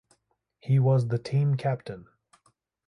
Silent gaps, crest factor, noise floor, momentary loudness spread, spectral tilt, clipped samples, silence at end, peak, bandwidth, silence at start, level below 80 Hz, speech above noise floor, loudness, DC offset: none; 14 dB; -72 dBFS; 20 LU; -9 dB/octave; under 0.1%; 0.85 s; -14 dBFS; 9.2 kHz; 0.65 s; -64 dBFS; 48 dB; -26 LUFS; under 0.1%